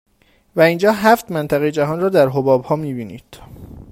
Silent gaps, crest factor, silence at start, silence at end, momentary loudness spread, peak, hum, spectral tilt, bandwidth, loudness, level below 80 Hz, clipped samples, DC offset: none; 18 dB; 0.55 s; 0.1 s; 13 LU; 0 dBFS; none; -6.5 dB/octave; 16 kHz; -16 LUFS; -50 dBFS; under 0.1%; under 0.1%